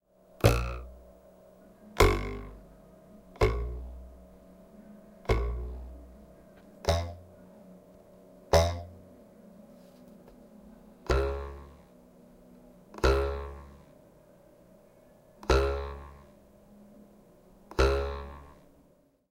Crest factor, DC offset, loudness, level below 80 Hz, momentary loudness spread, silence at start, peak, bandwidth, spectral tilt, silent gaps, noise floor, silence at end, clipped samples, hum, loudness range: 28 dB; under 0.1%; -30 LUFS; -38 dBFS; 28 LU; 0.4 s; -6 dBFS; 16.5 kHz; -5.5 dB/octave; none; -64 dBFS; 0.8 s; under 0.1%; none; 6 LU